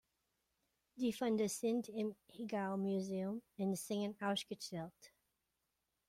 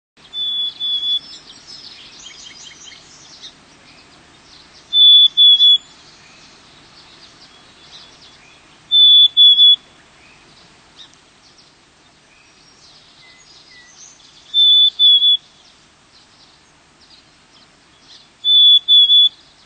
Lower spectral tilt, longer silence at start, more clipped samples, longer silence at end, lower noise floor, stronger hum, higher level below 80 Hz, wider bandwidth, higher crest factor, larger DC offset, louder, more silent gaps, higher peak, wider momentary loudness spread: first, -5 dB/octave vs 1 dB/octave; first, 0.95 s vs 0.35 s; neither; first, 1 s vs 0.4 s; first, -87 dBFS vs -50 dBFS; neither; second, -80 dBFS vs -64 dBFS; first, 16 kHz vs 9 kHz; about the same, 16 dB vs 14 dB; neither; second, -41 LUFS vs -8 LUFS; neither; second, -26 dBFS vs -2 dBFS; second, 9 LU vs 13 LU